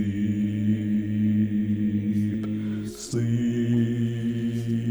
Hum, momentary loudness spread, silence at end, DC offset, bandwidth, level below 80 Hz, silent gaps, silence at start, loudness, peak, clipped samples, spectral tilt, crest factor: none; 5 LU; 0 s; under 0.1%; over 20 kHz; -54 dBFS; none; 0 s; -26 LUFS; -14 dBFS; under 0.1%; -7.5 dB/octave; 12 dB